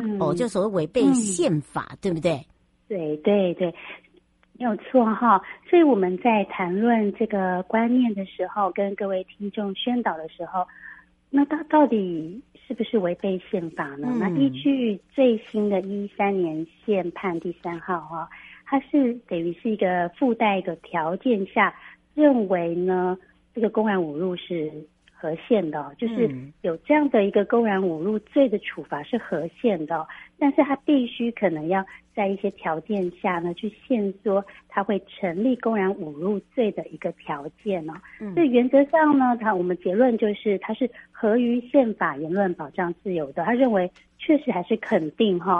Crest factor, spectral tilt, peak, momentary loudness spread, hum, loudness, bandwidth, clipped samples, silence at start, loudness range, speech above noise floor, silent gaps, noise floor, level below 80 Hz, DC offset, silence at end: 18 dB; -6 dB/octave; -4 dBFS; 11 LU; none; -24 LUFS; 11.5 kHz; under 0.1%; 0 s; 5 LU; 36 dB; none; -59 dBFS; -64 dBFS; under 0.1%; 0 s